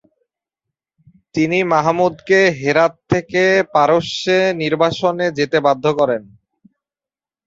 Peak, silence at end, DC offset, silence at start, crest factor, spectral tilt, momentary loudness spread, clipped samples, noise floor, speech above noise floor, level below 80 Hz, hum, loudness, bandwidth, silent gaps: 0 dBFS; 1.25 s; under 0.1%; 1.35 s; 16 dB; -5.5 dB/octave; 5 LU; under 0.1%; under -90 dBFS; over 74 dB; -54 dBFS; none; -16 LUFS; 7.8 kHz; none